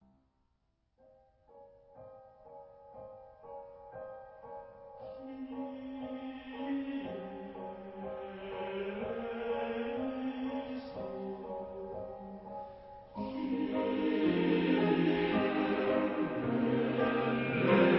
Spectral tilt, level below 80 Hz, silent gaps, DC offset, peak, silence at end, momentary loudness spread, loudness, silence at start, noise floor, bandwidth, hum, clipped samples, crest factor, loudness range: -5 dB/octave; -64 dBFS; none; under 0.1%; -14 dBFS; 0 s; 21 LU; -35 LUFS; 1.55 s; -77 dBFS; 5.6 kHz; none; under 0.1%; 22 dB; 20 LU